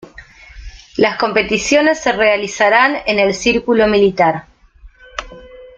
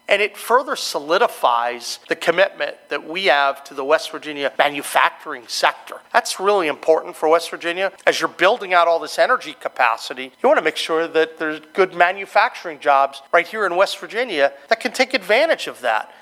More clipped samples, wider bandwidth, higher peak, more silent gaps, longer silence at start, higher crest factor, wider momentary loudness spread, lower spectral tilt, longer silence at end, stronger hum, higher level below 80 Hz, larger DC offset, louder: neither; second, 9 kHz vs 16 kHz; about the same, 0 dBFS vs 0 dBFS; neither; about the same, 0.2 s vs 0.1 s; second, 14 dB vs 20 dB; first, 15 LU vs 8 LU; first, -4 dB/octave vs -2 dB/octave; about the same, 0.1 s vs 0.15 s; neither; first, -42 dBFS vs -76 dBFS; neither; first, -13 LUFS vs -19 LUFS